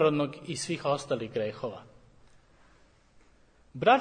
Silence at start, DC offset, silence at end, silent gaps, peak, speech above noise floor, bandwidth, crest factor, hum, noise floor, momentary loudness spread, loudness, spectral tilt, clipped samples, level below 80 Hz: 0 s; under 0.1%; 0 s; none; -8 dBFS; 33 dB; 9.6 kHz; 22 dB; none; -61 dBFS; 13 LU; -31 LUFS; -5 dB/octave; under 0.1%; -66 dBFS